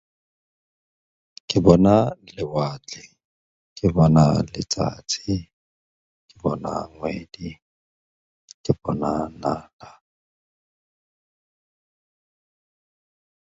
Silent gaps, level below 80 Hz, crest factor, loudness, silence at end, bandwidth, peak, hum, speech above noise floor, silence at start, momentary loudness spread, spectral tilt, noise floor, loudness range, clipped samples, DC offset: 3.25-3.76 s, 5.53-6.29 s, 7.62-8.48 s, 8.54-8.64 s, 9.73-9.79 s; -46 dBFS; 24 dB; -22 LUFS; 3.65 s; 7.8 kHz; 0 dBFS; none; over 69 dB; 1.5 s; 20 LU; -6.5 dB/octave; under -90 dBFS; 11 LU; under 0.1%; under 0.1%